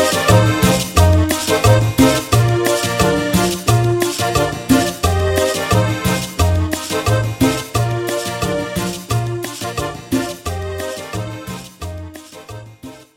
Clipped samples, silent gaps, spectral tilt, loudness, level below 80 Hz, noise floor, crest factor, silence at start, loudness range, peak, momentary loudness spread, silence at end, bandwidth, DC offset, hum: under 0.1%; none; -5 dB/octave; -16 LUFS; -30 dBFS; -37 dBFS; 16 dB; 0 s; 9 LU; 0 dBFS; 17 LU; 0.15 s; 17 kHz; under 0.1%; none